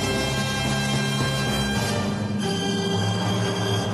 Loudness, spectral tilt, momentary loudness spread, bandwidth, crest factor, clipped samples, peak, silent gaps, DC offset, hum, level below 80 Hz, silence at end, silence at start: -24 LUFS; -4.5 dB/octave; 2 LU; 13 kHz; 12 dB; under 0.1%; -12 dBFS; none; under 0.1%; none; -42 dBFS; 0 s; 0 s